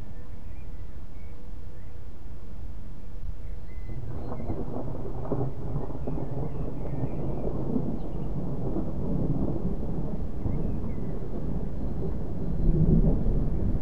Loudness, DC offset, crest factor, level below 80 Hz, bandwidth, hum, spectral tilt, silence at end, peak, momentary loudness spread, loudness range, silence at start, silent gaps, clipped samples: -32 LUFS; 5%; 18 dB; -34 dBFS; 4.6 kHz; none; -10.5 dB/octave; 0 s; -10 dBFS; 16 LU; 13 LU; 0 s; none; under 0.1%